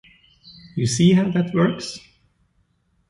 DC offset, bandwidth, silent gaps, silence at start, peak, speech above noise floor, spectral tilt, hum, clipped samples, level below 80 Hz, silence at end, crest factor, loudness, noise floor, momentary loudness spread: under 0.1%; 11.5 kHz; none; 0.45 s; -4 dBFS; 47 dB; -6 dB/octave; none; under 0.1%; -56 dBFS; 1.1 s; 18 dB; -19 LUFS; -65 dBFS; 17 LU